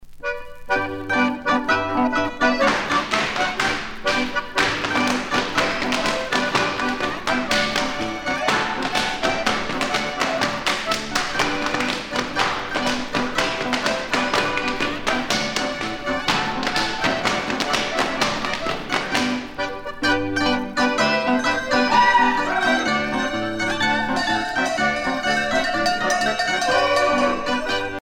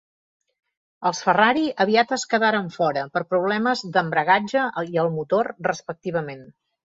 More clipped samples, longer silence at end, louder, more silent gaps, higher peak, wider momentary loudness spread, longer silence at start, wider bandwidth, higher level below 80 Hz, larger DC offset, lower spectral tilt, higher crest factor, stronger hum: neither; second, 0 s vs 0.35 s; about the same, -21 LUFS vs -22 LUFS; neither; about the same, -2 dBFS vs -2 dBFS; second, 5 LU vs 9 LU; second, 0 s vs 1 s; first, 18.5 kHz vs 7.8 kHz; first, -44 dBFS vs -66 dBFS; neither; second, -3 dB/octave vs -4.5 dB/octave; about the same, 18 dB vs 20 dB; neither